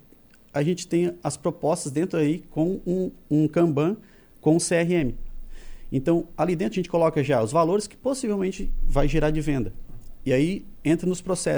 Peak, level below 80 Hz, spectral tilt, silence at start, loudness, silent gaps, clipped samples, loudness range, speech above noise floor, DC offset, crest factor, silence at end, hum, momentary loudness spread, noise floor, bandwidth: -6 dBFS; -34 dBFS; -6 dB/octave; 0.55 s; -25 LUFS; none; under 0.1%; 2 LU; 30 dB; under 0.1%; 18 dB; 0 s; none; 7 LU; -53 dBFS; over 20 kHz